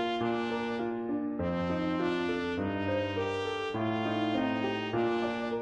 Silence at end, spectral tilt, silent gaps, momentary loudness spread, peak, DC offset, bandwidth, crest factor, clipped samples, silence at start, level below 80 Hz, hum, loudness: 0 s; -6.5 dB/octave; none; 3 LU; -18 dBFS; under 0.1%; 9.4 kHz; 12 dB; under 0.1%; 0 s; -56 dBFS; none; -32 LUFS